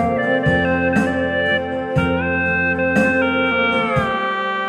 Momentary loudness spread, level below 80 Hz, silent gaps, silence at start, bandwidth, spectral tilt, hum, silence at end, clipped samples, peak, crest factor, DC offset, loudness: 4 LU; -44 dBFS; none; 0 s; 12 kHz; -6.5 dB/octave; none; 0 s; under 0.1%; -4 dBFS; 14 dB; under 0.1%; -17 LUFS